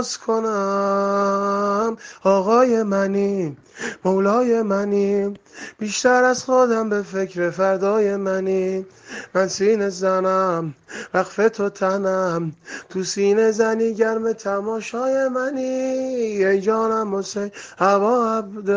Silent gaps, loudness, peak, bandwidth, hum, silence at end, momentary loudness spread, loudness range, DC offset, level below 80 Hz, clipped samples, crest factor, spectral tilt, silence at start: none; -20 LUFS; -4 dBFS; 9.8 kHz; none; 0 s; 10 LU; 2 LU; under 0.1%; -66 dBFS; under 0.1%; 16 dB; -5 dB/octave; 0 s